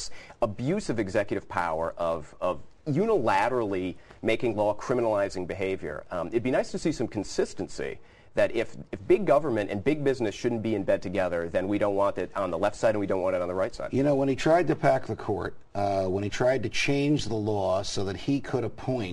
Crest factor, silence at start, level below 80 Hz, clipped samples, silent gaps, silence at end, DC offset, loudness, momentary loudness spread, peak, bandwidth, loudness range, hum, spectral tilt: 18 dB; 0 s; -52 dBFS; under 0.1%; none; 0 s; 0.3%; -28 LUFS; 8 LU; -8 dBFS; 12 kHz; 3 LU; none; -6 dB/octave